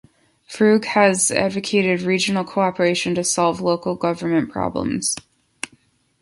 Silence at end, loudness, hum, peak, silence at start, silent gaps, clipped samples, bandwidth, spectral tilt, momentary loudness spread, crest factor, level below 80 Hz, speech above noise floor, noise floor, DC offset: 0.55 s; -19 LUFS; none; -2 dBFS; 0.5 s; none; under 0.1%; 11.5 kHz; -4 dB/octave; 12 LU; 18 dB; -54 dBFS; 39 dB; -58 dBFS; under 0.1%